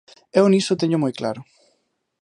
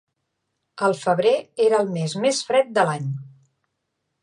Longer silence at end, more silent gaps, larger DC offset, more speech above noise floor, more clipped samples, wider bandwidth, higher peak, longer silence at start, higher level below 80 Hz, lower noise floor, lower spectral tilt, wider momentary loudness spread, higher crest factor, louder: second, 0.8 s vs 0.95 s; neither; neither; second, 51 dB vs 56 dB; neither; about the same, 11 kHz vs 11 kHz; about the same, -4 dBFS vs -6 dBFS; second, 0.35 s vs 0.75 s; first, -68 dBFS vs -74 dBFS; second, -69 dBFS vs -77 dBFS; about the same, -6 dB/octave vs -5 dB/octave; first, 12 LU vs 7 LU; about the same, 18 dB vs 18 dB; about the same, -20 LUFS vs -21 LUFS